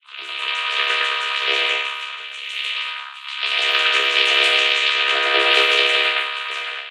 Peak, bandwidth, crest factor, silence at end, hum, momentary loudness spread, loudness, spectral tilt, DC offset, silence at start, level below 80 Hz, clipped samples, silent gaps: -2 dBFS; 16 kHz; 18 dB; 0 s; none; 14 LU; -17 LUFS; 2.5 dB/octave; under 0.1%; 0.1 s; -90 dBFS; under 0.1%; none